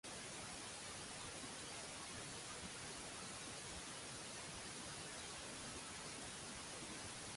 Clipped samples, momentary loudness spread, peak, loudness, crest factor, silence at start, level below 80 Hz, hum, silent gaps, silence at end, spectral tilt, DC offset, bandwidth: under 0.1%; 0 LU; -38 dBFS; -49 LUFS; 14 dB; 0.05 s; -68 dBFS; none; none; 0 s; -2 dB/octave; under 0.1%; 11.5 kHz